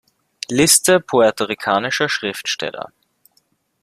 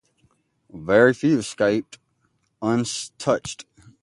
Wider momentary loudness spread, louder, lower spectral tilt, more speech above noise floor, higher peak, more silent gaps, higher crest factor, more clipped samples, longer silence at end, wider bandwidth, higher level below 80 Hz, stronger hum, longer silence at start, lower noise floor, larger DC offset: about the same, 17 LU vs 15 LU; first, -16 LUFS vs -21 LUFS; second, -2.5 dB/octave vs -5 dB/octave; about the same, 46 dB vs 48 dB; first, 0 dBFS vs -4 dBFS; neither; about the same, 20 dB vs 20 dB; neither; first, 0.95 s vs 0.4 s; first, 15.5 kHz vs 11.5 kHz; about the same, -56 dBFS vs -58 dBFS; neither; second, 0.5 s vs 0.75 s; second, -63 dBFS vs -69 dBFS; neither